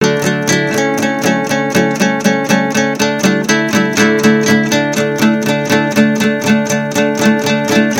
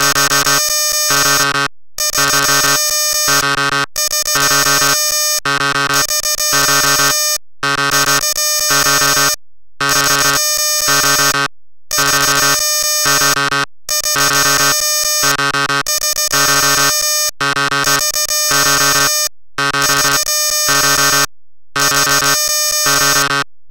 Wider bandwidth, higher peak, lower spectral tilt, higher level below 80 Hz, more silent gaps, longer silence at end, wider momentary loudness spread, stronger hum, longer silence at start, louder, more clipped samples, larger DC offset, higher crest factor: about the same, 17 kHz vs 17.5 kHz; about the same, 0 dBFS vs 0 dBFS; first, -4.5 dB/octave vs 0 dB/octave; second, -54 dBFS vs -42 dBFS; neither; about the same, 0 s vs 0 s; about the same, 3 LU vs 5 LU; neither; about the same, 0 s vs 0 s; about the same, -12 LUFS vs -11 LUFS; neither; neither; about the same, 12 dB vs 14 dB